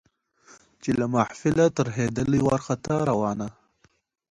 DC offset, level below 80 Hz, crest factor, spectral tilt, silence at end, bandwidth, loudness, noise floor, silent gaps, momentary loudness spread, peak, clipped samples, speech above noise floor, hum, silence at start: under 0.1%; -52 dBFS; 18 dB; -7 dB/octave; 0.8 s; 11.5 kHz; -25 LUFS; -66 dBFS; none; 7 LU; -6 dBFS; under 0.1%; 42 dB; none; 0.85 s